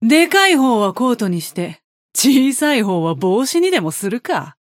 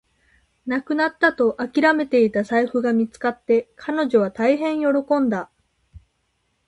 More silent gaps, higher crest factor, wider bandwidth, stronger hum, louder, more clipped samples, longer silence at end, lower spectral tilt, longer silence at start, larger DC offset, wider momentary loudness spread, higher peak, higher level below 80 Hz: first, 1.84-2.09 s vs none; about the same, 16 dB vs 18 dB; first, 17 kHz vs 11 kHz; neither; first, -15 LUFS vs -20 LUFS; neither; second, 0.1 s vs 0.7 s; second, -4 dB/octave vs -6.5 dB/octave; second, 0 s vs 0.65 s; neither; about the same, 11 LU vs 9 LU; first, 0 dBFS vs -4 dBFS; second, -70 dBFS vs -60 dBFS